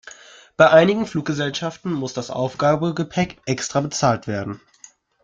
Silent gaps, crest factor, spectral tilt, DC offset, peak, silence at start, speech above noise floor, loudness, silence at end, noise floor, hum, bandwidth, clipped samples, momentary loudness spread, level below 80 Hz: none; 20 dB; -5 dB/octave; under 0.1%; -2 dBFS; 0.05 s; 30 dB; -20 LUFS; 0.7 s; -50 dBFS; none; 9.2 kHz; under 0.1%; 14 LU; -56 dBFS